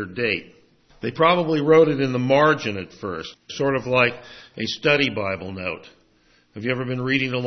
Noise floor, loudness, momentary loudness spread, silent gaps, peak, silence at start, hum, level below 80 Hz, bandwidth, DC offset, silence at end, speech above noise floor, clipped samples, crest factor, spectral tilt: -59 dBFS; -21 LUFS; 14 LU; none; -4 dBFS; 0 s; none; -58 dBFS; 6.4 kHz; under 0.1%; 0 s; 38 dB; under 0.1%; 18 dB; -6 dB/octave